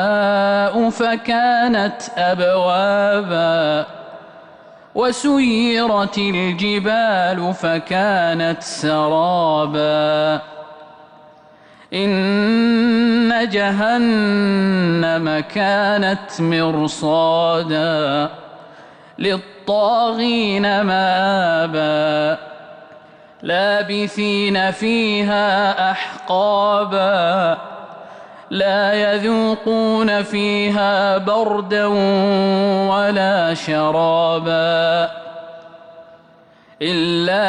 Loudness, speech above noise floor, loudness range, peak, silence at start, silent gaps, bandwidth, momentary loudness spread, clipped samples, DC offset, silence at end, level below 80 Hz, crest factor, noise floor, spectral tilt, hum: -17 LUFS; 32 dB; 3 LU; -8 dBFS; 0 s; none; 10.5 kHz; 6 LU; under 0.1%; under 0.1%; 0 s; -56 dBFS; 10 dB; -48 dBFS; -5.5 dB/octave; none